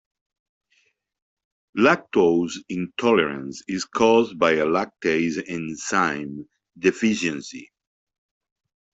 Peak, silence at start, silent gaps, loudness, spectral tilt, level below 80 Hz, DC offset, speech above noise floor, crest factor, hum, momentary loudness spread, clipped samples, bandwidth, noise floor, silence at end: -4 dBFS; 1.75 s; none; -22 LUFS; -4.5 dB/octave; -62 dBFS; under 0.1%; 45 dB; 20 dB; none; 14 LU; under 0.1%; 8.2 kHz; -67 dBFS; 1.35 s